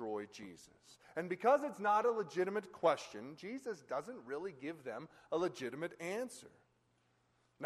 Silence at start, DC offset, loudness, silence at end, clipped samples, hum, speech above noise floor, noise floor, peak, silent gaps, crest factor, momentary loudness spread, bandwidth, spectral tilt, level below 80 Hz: 0 s; under 0.1%; -39 LUFS; 0 s; under 0.1%; none; 37 dB; -76 dBFS; -20 dBFS; none; 20 dB; 16 LU; 13 kHz; -5 dB/octave; -82 dBFS